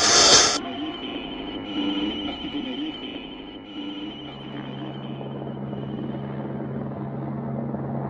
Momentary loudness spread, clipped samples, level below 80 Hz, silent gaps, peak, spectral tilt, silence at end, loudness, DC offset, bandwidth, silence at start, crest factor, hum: 16 LU; under 0.1%; -54 dBFS; none; -2 dBFS; -2 dB/octave; 0 s; -24 LUFS; under 0.1%; 11.5 kHz; 0 s; 24 dB; none